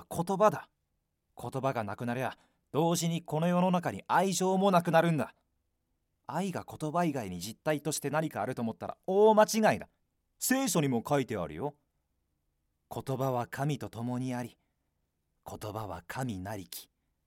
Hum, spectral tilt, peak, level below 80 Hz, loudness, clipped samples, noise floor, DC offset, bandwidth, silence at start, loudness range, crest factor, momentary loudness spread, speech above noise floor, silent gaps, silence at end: none; -5.5 dB/octave; -10 dBFS; -68 dBFS; -31 LUFS; under 0.1%; -81 dBFS; under 0.1%; 17 kHz; 0 s; 8 LU; 22 dB; 15 LU; 50 dB; none; 0.45 s